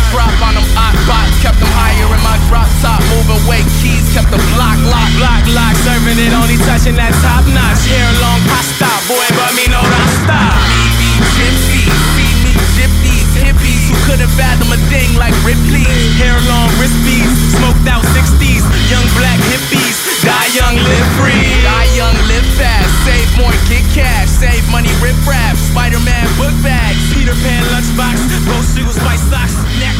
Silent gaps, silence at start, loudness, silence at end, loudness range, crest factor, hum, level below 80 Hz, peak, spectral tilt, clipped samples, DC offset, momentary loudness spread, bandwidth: none; 0 s; -10 LUFS; 0 s; 2 LU; 8 dB; none; -12 dBFS; 0 dBFS; -4.5 dB/octave; under 0.1%; under 0.1%; 3 LU; 16.5 kHz